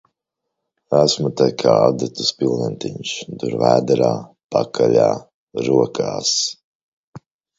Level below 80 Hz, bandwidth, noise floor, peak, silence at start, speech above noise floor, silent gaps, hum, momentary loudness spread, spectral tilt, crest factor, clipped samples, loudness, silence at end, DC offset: -58 dBFS; 8 kHz; -80 dBFS; 0 dBFS; 0.9 s; 62 dB; 4.44-4.49 s, 5.34-5.47 s, 6.64-7.13 s; none; 11 LU; -4.5 dB/octave; 18 dB; under 0.1%; -18 LUFS; 0.4 s; under 0.1%